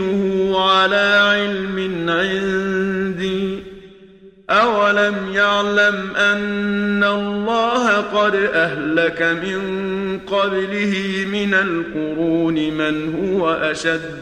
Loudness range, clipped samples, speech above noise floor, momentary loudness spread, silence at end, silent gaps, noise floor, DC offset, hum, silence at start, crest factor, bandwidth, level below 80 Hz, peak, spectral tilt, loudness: 3 LU; under 0.1%; 27 dB; 8 LU; 0 s; none; -44 dBFS; under 0.1%; none; 0 s; 16 dB; 10 kHz; -50 dBFS; -2 dBFS; -5 dB/octave; -18 LUFS